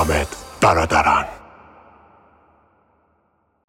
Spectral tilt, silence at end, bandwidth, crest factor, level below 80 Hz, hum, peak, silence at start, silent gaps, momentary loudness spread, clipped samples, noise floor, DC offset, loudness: -4.5 dB/octave; 2.3 s; 16.5 kHz; 20 dB; -38 dBFS; none; -2 dBFS; 0 s; none; 15 LU; under 0.1%; -65 dBFS; under 0.1%; -18 LUFS